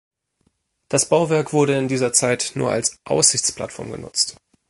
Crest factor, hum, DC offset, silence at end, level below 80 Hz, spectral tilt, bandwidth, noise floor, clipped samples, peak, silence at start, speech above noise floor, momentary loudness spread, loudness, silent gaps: 20 dB; none; under 0.1%; 0.4 s; -56 dBFS; -3 dB/octave; 12 kHz; -68 dBFS; under 0.1%; 0 dBFS; 0.9 s; 48 dB; 9 LU; -19 LUFS; none